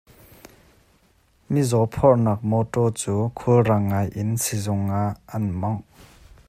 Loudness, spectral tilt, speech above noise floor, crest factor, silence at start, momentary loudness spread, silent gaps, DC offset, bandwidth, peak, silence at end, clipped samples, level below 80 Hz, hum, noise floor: -22 LUFS; -6.5 dB/octave; 39 dB; 18 dB; 1.5 s; 9 LU; none; under 0.1%; 15.5 kHz; -4 dBFS; 0.7 s; under 0.1%; -50 dBFS; none; -60 dBFS